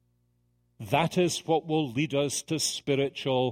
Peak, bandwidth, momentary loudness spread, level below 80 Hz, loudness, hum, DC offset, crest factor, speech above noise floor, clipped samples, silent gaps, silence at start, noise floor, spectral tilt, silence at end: -8 dBFS; 16 kHz; 3 LU; -66 dBFS; -28 LUFS; 60 Hz at -55 dBFS; under 0.1%; 20 dB; 43 dB; under 0.1%; none; 0.8 s; -70 dBFS; -4.5 dB/octave; 0 s